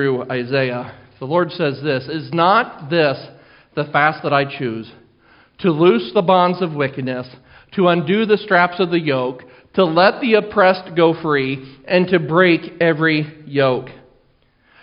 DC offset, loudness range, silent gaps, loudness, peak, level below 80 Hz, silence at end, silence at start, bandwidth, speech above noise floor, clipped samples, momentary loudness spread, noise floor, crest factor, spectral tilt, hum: under 0.1%; 3 LU; none; -17 LUFS; 0 dBFS; -58 dBFS; 0.9 s; 0 s; 5.4 kHz; 41 dB; under 0.1%; 12 LU; -57 dBFS; 18 dB; -4 dB/octave; none